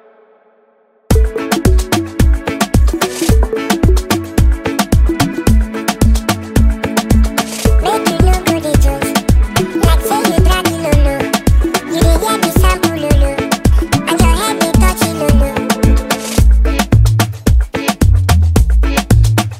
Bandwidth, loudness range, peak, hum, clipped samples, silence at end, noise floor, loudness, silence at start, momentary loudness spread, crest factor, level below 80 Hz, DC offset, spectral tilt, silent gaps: 16.5 kHz; 1 LU; 0 dBFS; none; under 0.1%; 0 s; -52 dBFS; -13 LUFS; 1.1 s; 4 LU; 12 dB; -14 dBFS; under 0.1%; -5.5 dB/octave; none